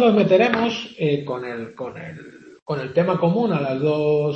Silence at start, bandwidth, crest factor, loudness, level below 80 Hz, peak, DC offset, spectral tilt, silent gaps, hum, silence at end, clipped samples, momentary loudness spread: 0 s; 7.2 kHz; 20 dB; -21 LUFS; -64 dBFS; 0 dBFS; under 0.1%; -7.5 dB/octave; 2.62-2.66 s; none; 0 s; under 0.1%; 17 LU